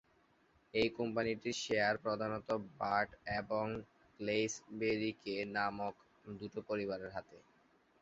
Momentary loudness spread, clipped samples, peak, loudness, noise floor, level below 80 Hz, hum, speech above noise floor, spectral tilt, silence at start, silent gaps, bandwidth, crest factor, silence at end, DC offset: 11 LU; under 0.1%; -20 dBFS; -38 LUFS; -72 dBFS; -68 dBFS; none; 34 dB; -3 dB/octave; 0.75 s; none; 7.6 kHz; 20 dB; 0.65 s; under 0.1%